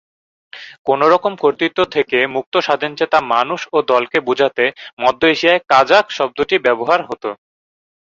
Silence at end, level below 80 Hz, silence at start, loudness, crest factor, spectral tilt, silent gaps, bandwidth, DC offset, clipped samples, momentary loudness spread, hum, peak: 0.75 s; -58 dBFS; 0.55 s; -15 LUFS; 16 dB; -4.5 dB/octave; 0.79-0.85 s, 2.46-2.52 s, 4.93-4.97 s; 7.6 kHz; under 0.1%; under 0.1%; 7 LU; none; 0 dBFS